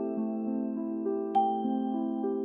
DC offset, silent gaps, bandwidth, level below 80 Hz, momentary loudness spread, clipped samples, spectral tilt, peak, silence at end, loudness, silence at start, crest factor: under 0.1%; none; 3.8 kHz; -80 dBFS; 5 LU; under 0.1%; -10.5 dB/octave; -16 dBFS; 0 s; -31 LUFS; 0 s; 14 dB